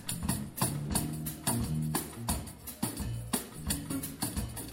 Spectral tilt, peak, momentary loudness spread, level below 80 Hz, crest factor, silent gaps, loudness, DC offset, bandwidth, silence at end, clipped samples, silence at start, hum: -4 dB/octave; -14 dBFS; 5 LU; -46 dBFS; 20 dB; none; -34 LUFS; under 0.1%; 17 kHz; 0 s; under 0.1%; 0 s; none